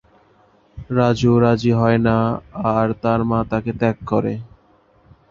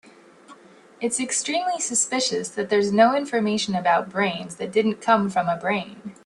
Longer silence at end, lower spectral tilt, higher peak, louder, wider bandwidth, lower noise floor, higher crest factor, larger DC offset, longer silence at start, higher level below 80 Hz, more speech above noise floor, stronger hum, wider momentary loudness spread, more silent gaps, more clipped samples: first, 0.85 s vs 0.1 s; first, -8 dB/octave vs -3 dB/octave; about the same, -2 dBFS vs -4 dBFS; first, -18 LUFS vs -22 LUFS; second, 7.4 kHz vs 12.5 kHz; first, -55 dBFS vs -49 dBFS; about the same, 18 dB vs 20 dB; neither; first, 0.75 s vs 0.5 s; first, -44 dBFS vs -68 dBFS; first, 38 dB vs 27 dB; neither; about the same, 8 LU vs 8 LU; neither; neither